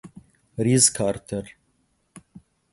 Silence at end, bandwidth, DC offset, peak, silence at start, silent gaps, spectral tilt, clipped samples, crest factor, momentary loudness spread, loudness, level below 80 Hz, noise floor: 0.55 s; 12 kHz; under 0.1%; -2 dBFS; 0.05 s; none; -4 dB/octave; under 0.1%; 24 dB; 16 LU; -21 LUFS; -56 dBFS; -68 dBFS